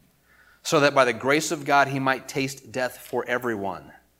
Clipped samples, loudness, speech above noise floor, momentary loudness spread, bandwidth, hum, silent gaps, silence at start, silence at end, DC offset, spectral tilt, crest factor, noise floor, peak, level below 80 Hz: under 0.1%; -24 LUFS; 34 dB; 11 LU; 16.5 kHz; none; none; 0.65 s; 0.3 s; under 0.1%; -4 dB/octave; 22 dB; -58 dBFS; -4 dBFS; -66 dBFS